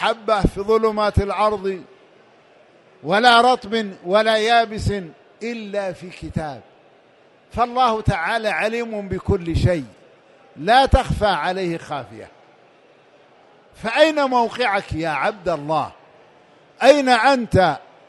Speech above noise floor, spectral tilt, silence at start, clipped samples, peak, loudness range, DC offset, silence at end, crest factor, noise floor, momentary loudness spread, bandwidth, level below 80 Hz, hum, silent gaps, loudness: 34 dB; -5.5 dB/octave; 0 s; under 0.1%; 0 dBFS; 5 LU; under 0.1%; 0.3 s; 20 dB; -53 dBFS; 16 LU; 11.5 kHz; -36 dBFS; none; none; -19 LUFS